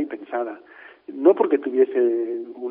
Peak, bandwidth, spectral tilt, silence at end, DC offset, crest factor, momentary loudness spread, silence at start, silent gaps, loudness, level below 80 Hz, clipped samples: -2 dBFS; 3.6 kHz; -4.5 dB/octave; 0 s; under 0.1%; 20 dB; 19 LU; 0 s; none; -21 LUFS; -80 dBFS; under 0.1%